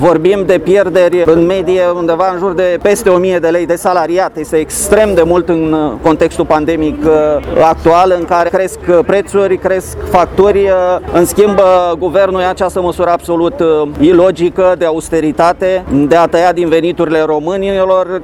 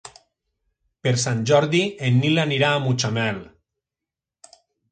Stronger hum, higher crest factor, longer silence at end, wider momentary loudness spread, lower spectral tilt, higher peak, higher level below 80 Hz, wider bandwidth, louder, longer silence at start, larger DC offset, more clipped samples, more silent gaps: neither; second, 10 dB vs 20 dB; second, 0 s vs 1.5 s; about the same, 5 LU vs 7 LU; about the same, -5.5 dB/octave vs -5 dB/octave; first, 0 dBFS vs -4 dBFS; first, -34 dBFS vs -60 dBFS; first, 17 kHz vs 9.4 kHz; first, -10 LUFS vs -20 LUFS; about the same, 0 s vs 0.05 s; neither; first, 0.3% vs under 0.1%; neither